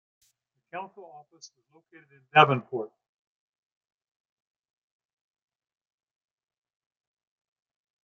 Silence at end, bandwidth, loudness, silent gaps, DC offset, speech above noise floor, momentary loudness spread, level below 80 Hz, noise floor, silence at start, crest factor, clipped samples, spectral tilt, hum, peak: 5.15 s; 7.2 kHz; -23 LUFS; none; under 0.1%; 45 dB; 22 LU; -82 dBFS; -73 dBFS; 0.75 s; 28 dB; under 0.1%; -3 dB/octave; none; -4 dBFS